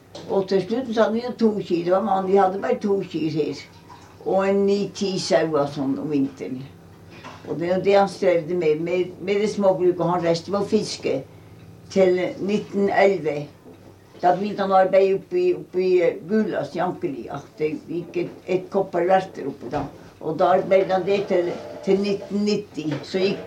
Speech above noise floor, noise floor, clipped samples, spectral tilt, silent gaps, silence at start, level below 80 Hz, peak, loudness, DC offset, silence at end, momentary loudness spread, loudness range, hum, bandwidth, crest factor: 24 dB; -46 dBFS; under 0.1%; -6 dB/octave; none; 0.15 s; -62 dBFS; -4 dBFS; -22 LUFS; under 0.1%; 0 s; 11 LU; 3 LU; none; 10.5 kHz; 18 dB